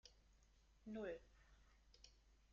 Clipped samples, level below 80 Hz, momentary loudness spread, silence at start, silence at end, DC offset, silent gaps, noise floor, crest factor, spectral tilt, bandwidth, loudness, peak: under 0.1%; -72 dBFS; 17 LU; 0.05 s; 0 s; under 0.1%; none; -74 dBFS; 20 dB; -4.5 dB/octave; 7.2 kHz; -54 LUFS; -38 dBFS